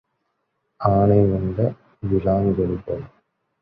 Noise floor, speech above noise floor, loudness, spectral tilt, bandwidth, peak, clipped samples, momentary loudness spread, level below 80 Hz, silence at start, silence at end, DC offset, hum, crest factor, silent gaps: -73 dBFS; 54 dB; -21 LUFS; -12.5 dB/octave; 5 kHz; -2 dBFS; under 0.1%; 13 LU; -40 dBFS; 0.8 s; 0.55 s; under 0.1%; none; 20 dB; none